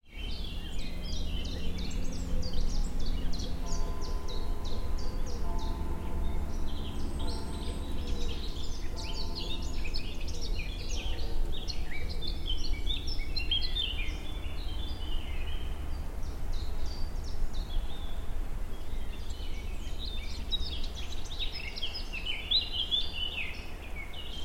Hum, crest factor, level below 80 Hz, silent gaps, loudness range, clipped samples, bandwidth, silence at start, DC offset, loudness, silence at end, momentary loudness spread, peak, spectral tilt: none; 14 dB; -34 dBFS; none; 7 LU; under 0.1%; 12.5 kHz; 0.05 s; under 0.1%; -37 LUFS; 0 s; 9 LU; -16 dBFS; -4 dB/octave